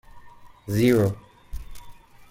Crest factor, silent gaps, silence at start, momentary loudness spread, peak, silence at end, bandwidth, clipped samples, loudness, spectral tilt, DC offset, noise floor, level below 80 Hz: 18 dB; none; 0.15 s; 24 LU; -8 dBFS; 0.4 s; 16.5 kHz; under 0.1%; -22 LUFS; -7 dB/octave; under 0.1%; -46 dBFS; -44 dBFS